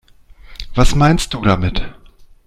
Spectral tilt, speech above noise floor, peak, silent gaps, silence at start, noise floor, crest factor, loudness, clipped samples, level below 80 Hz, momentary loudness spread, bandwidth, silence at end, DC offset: -5.5 dB/octave; 28 dB; 0 dBFS; none; 0.5 s; -41 dBFS; 16 dB; -16 LUFS; under 0.1%; -22 dBFS; 21 LU; 13.5 kHz; 0.2 s; under 0.1%